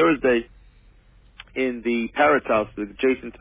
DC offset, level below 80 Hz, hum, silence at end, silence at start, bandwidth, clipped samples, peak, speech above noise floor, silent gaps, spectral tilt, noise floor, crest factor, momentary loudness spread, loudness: under 0.1%; -50 dBFS; none; 0.1 s; 0 s; 3.9 kHz; under 0.1%; -6 dBFS; 31 dB; none; -9 dB/octave; -53 dBFS; 18 dB; 8 LU; -22 LUFS